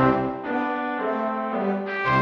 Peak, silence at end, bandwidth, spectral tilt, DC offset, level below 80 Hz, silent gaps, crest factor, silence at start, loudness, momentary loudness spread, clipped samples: -8 dBFS; 0 s; 6.6 kHz; -8 dB/octave; under 0.1%; -52 dBFS; none; 16 dB; 0 s; -25 LUFS; 4 LU; under 0.1%